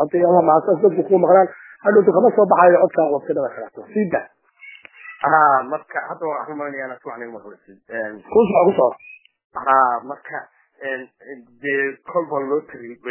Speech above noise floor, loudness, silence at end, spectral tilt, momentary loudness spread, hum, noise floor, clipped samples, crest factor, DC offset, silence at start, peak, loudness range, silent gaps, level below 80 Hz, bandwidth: 26 dB; -18 LUFS; 0 s; -10.5 dB/octave; 19 LU; none; -44 dBFS; under 0.1%; 18 dB; under 0.1%; 0 s; 0 dBFS; 7 LU; 9.44-9.50 s; -64 dBFS; 3.2 kHz